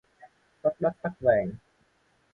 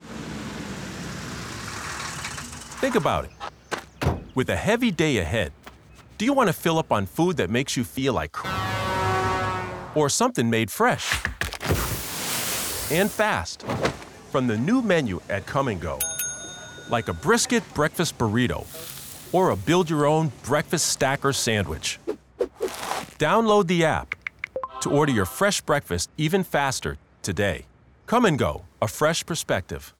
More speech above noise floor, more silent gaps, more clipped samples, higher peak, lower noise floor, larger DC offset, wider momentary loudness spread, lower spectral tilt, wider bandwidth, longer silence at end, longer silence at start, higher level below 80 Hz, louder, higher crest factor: first, 42 dB vs 26 dB; neither; neither; about the same, -10 dBFS vs -8 dBFS; first, -68 dBFS vs -49 dBFS; neither; about the same, 11 LU vs 12 LU; first, -9.5 dB/octave vs -4.5 dB/octave; second, 3.9 kHz vs over 20 kHz; first, 0.75 s vs 0.1 s; first, 0.65 s vs 0 s; second, -60 dBFS vs -46 dBFS; second, -28 LUFS vs -24 LUFS; about the same, 20 dB vs 16 dB